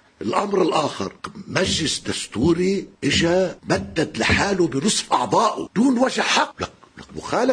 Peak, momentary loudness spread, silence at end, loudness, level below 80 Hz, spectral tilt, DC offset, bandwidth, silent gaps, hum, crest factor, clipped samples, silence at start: -2 dBFS; 8 LU; 0 s; -20 LUFS; -46 dBFS; -4 dB/octave; under 0.1%; 10.5 kHz; none; none; 18 dB; under 0.1%; 0.2 s